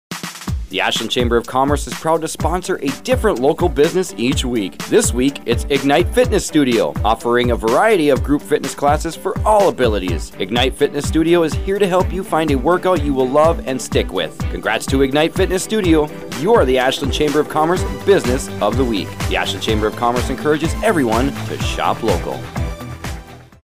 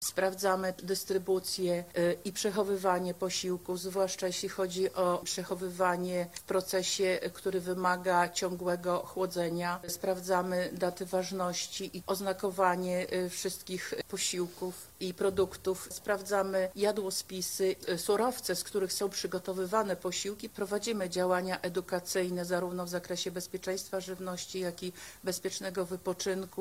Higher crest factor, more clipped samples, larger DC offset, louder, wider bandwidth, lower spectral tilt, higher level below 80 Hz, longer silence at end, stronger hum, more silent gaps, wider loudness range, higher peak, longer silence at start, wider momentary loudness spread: second, 14 dB vs 20 dB; neither; first, 1% vs under 0.1%; first, -17 LUFS vs -33 LUFS; about the same, 16 kHz vs 16 kHz; first, -5 dB/octave vs -3.5 dB/octave; first, -28 dBFS vs -66 dBFS; about the same, 0.1 s vs 0 s; neither; neither; about the same, 2 LU vs 3 LU; first, -2 dBFS vs -12 dBFS; about the same, 0.1 s vs 0 s; about the same, 8 LU vs 7 LU